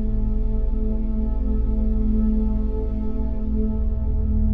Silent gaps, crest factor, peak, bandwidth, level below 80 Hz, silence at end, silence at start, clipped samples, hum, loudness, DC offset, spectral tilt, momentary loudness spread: none; 10 dB; -10 dBFS; 1.8 kHz; -22 dBFS; 0 s; 0 s; under 0.1%; none; -25 LUFS; 2%; -12.5 dB/octave; 5 LU